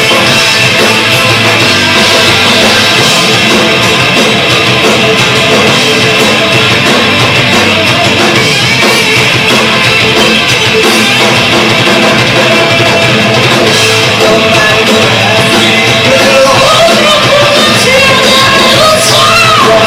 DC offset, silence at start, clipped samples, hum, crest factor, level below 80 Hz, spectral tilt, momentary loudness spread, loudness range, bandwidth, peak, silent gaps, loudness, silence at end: under 0.1%; 0 s; 2%; none; 6 dB; -36 dBFS; -3 dB/octave; 2 LU; 1 LU; over 20 kHz; 0 dBFS; none; -4 LUFS; 0 s